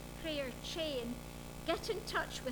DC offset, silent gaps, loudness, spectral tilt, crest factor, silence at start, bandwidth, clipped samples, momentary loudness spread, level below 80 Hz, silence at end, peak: under 0.1%; none; -40 LUFS; -3.5 dB/octave; 18 dB; 0 s; over 20 kHz; under 0.1%; 7 LU; -54 dBFS; 0 s; -22 dBFS